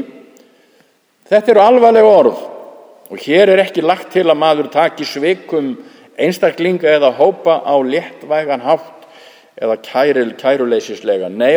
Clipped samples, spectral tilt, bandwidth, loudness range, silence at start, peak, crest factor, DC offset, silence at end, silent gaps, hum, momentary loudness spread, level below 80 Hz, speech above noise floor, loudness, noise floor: under 0.1%; -5.5 dB/octave; over 20 kHz; 5 LU; 0 s; 0 dBFS; 14 dB; under 0.1%; 0 s; none; none; 12 LU; -66 dBFS; 42 dB; -13 LUFS; -54 dBFS